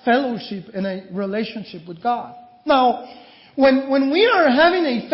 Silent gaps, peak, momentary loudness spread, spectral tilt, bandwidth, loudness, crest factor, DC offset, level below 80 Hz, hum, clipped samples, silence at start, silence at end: none; -4 dBFS; 17 LU; -9.5 dB/octave; 5.8 kHz; -19 LUFS; 14 dB; under 0.1%; -60 dBFS; none; under 0.1%; 0.05 s; 0 s